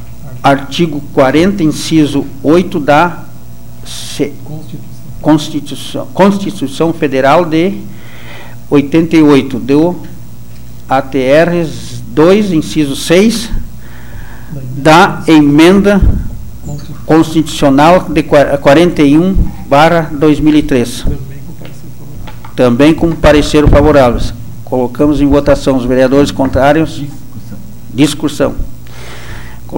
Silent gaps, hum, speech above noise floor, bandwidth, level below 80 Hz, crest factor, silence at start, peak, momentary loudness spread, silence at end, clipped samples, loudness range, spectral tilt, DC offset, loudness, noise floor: none; 60 Hz at -35 dBFS; 23 dB; 17 kHz; -24 dBFS; 10 dB; 0 s; 0 dBFS; 22 LU; 0 s; 0.2%; 5 LU; -6 dB/octave; 7%; -9 LUFS; -31 dBFS